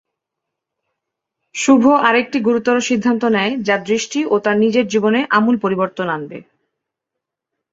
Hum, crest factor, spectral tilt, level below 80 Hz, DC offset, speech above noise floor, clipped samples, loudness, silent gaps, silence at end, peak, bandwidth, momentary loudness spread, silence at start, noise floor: none; 16 dB; -4.5 dB/octave; -62 dBFS; under 0.1%; 66 dB; under 0.1%; -16 LUFS; none; 1.3 s; -2 dBFS; 8 kHz; 8 LU; 1.55 s; -81 dBFS